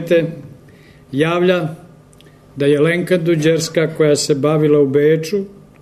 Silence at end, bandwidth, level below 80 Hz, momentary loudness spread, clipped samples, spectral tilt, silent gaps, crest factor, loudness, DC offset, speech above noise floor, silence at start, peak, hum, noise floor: 0.3 s; 13.5 kHz; -56 dBFS; 12 LU; under 0.1%; -5.5 dB/octave; none; 12 dB; -15 LUFS; under 0.1%; 30 dB; 0 s; -4 dBFS; none; -44 dBFS